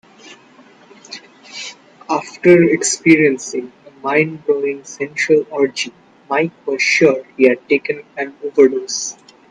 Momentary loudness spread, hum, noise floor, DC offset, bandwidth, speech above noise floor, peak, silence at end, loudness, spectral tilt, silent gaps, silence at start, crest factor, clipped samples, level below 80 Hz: 18 LU; none; -46 dBFS; under 0.1%; 10 kHz; 31 dB; 0 dBFS; 0.4 s; -16 LUFS; -4 dB/octave; none; 0.25 s; 16 dB; under 0.1%; -64 dBFS